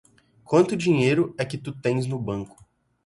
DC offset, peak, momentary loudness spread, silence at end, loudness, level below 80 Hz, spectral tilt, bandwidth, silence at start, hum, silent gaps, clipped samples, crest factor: under 0.1%; -6 dBFS; 11 LU; 0.6 s; -24 LUFS; -58 dBFS; -6.5 dB/octave; 11.5 kHz; 0.5 s; none; none; under 0.1%; 18 dB